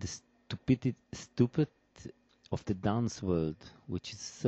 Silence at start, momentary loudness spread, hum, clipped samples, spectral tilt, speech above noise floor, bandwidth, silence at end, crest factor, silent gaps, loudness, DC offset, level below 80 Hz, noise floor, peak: 0 s; 18 LU; none; under 0.1%; -6.5 dB/octave; 19 dB; 8.2 kHz; 0 s; 22 dB; none; -34 LUFS; under 0.1%; -58 dBFS; -52 dBFS; -14 dBFS